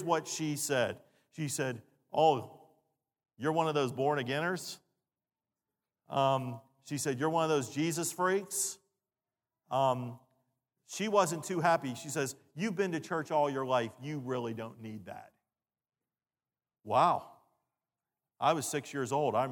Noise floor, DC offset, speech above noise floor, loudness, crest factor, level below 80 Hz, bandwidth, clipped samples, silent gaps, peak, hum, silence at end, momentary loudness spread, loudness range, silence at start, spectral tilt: under -90 dBFS; under 0.1%; over 58 dB; -33 LUFS; 22 dB; -82 dBFS; 19 kHz; under 0.1%; none; -12 dBFS; none; 0 s; 15 LU; 4 LU; 0 s; -4.5 dB/octave